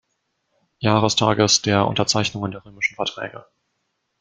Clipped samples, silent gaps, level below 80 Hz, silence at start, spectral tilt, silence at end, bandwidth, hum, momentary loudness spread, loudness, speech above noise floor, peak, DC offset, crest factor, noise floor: under 0.1%; none; -56 dBFS; 0.8 s; -3.5 dB/octave; 0.8 s; 9.4 kHz; none; 14 LU; -20 LUFS; 53 dB; -2 dBFS; under 0.1%; 22 dB; -74 dBFS